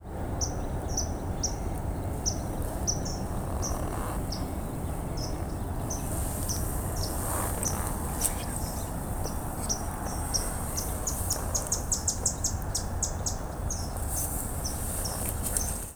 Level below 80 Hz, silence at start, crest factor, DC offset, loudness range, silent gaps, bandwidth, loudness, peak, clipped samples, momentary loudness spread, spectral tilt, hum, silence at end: -36 dBFS; 0 s; 26 dB; under 0.1%; 3 LU; none; over 20 kHz; -31 LUFS; -4 dBFS; under 0.1%; 5 LU; -3.5 dB/octave; none; 0 s